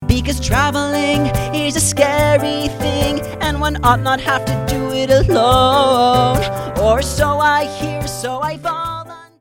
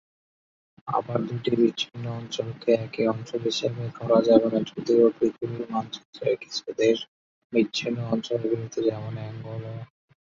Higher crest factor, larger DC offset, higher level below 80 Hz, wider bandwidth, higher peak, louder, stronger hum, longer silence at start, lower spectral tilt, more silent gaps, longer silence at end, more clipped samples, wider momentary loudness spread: second, 14 dB vs 22 dB; neither; first, -28 dBFS vs -64 dBFS; first, 17.5 kHz vs 7.6 kHz; first, 0 dBFS vs -4 dBFS; first, -16 LUFS vs -26 LUFS; neither; second, 0 s vs 0.85 s; second, -4.5 dB/octave vs -6 dB/octave; second, none vs 6.05-6.13 s, 7.08-7.50 s; second, 0.15 s vs 0.4 s; neither; second, 9 LU vs 15 LU